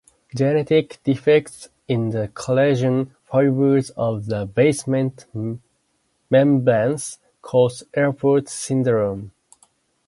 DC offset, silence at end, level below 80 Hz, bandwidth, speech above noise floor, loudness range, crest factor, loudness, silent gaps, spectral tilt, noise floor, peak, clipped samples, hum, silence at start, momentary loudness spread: under 0.1%; 0.8 s; -56 dBFS; 11.5 kHz; 49 dB; 2 LU; 16 dB; -20 LUFS; none; -6.5 dB/octave; -68 dBFS; -4 dBFS; under 0.1%; none; 0.35 s; 12 LU